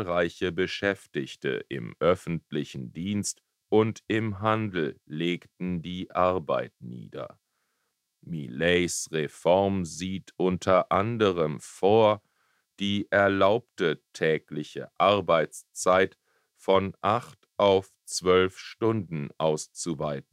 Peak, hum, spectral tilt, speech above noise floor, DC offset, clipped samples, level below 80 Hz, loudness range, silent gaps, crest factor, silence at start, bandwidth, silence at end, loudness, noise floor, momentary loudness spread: -8 dBFS; none; -5 dB/octave; 52 dB; under 0.1%; under 0.1%; -62 dBFS; 5 LU; none; 20 dB; 0 s; 14.5 kHz; 0.1 s; -27 LUFS; -78 dBFS; 12 LU